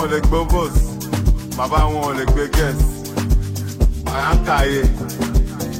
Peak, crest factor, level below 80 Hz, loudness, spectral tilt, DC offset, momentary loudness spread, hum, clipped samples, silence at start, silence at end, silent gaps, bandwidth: -2 dBFS; 16 dB; -18 dBFS; -19 LUFS; -5.5 dB/octave; under 0.1%; 4 LU; none; under 0.1%; 0 s; 0 s; none; 16.5 kHz